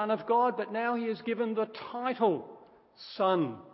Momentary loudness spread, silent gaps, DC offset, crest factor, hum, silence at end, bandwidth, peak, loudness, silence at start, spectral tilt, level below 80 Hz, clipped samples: 9 LU; none; under 0.1%; 16 dB; none; 0 s; 5.8 kHz; -14 dBFS; -30 LUFS; 0 s; -9.5 dB/octave; -80 dBFS; under 0.1%